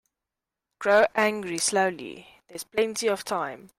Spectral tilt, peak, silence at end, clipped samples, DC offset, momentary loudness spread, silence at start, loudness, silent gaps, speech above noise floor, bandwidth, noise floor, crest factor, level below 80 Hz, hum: -2.5 dB/octave; -8 dBFS; 0.1 s; under 0.1%; under 0.1%; 18 LU; 0.8 s; -25 LUFS; none; 62 dB; 16 kHz; -88 dBFS; 18 dB; -68 dBFS; none